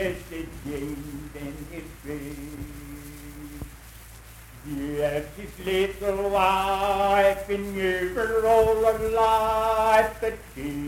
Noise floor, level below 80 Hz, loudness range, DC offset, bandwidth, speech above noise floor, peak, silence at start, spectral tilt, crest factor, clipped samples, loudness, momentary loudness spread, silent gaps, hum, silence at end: -45 dBFS; -44 dBFS; 16 LU; under 0.1%; 17 kHz; 20 dB; -6 dBFS; 0 s; -5 dB/octave; 20 dB; under 0.1%; -24 LUFS; 21 LU; none; none; 0 s